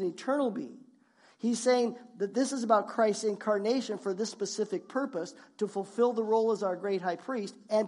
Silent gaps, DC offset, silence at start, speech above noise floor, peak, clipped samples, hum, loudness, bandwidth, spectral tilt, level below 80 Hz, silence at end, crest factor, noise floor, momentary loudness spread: none; under 0.1%; 0 s; 33 dB; -12 dBFS; under 0.1%; none; -31 LUFS; 11.5 kHz; -4.5 dB/octave; -90 dBFS; 0 s; 18 dB; -63 dBFS; 10 LU